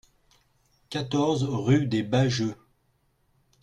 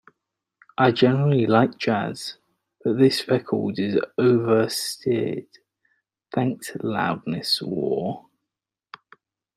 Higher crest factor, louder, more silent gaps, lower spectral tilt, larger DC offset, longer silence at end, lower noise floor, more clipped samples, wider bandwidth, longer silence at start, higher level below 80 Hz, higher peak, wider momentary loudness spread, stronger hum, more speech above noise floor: about the same, 18 dB vs 20 dB; second, -26 LUFS vs -22 LUFS; neither; about the same, -6.5 dB/octave vs -6 dB/octave; neither; second, 1.1 s vs 1.4 s; second, -69 dBFS vs -86 dBFS; neither; second, 9.6 kHz vs 16 kHz; about the same, 0.9 s vs 0.8 s; first, -58 dBFS vs -66 dBFS; second, -10 dBFS vs -4 dBFS; second, 9 LU vs 12 LU; neither; second, 45 dB vs 64 dB